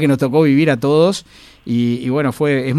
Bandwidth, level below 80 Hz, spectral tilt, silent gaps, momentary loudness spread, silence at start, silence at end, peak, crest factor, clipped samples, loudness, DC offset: 14 kHz; -52 dBFS; -7 dB/octave; none; 8 LU; 0 s; 0 s; -2 dBFS; 14 dB; under 0.1%; -15 LUFS; under 0.1%